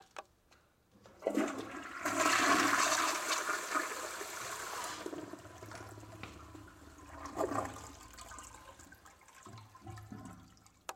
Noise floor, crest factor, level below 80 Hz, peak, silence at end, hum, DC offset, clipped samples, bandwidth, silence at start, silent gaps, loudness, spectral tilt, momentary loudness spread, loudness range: -68 dBFS; 22 dB; -66 dBFS; -16 dBFS; 0 s; none; under 0.1%; under 0.1%; 16.5 kHz; 0 s; none; -34 LUFS; -2 dB/octave; 25 LU; 13 LU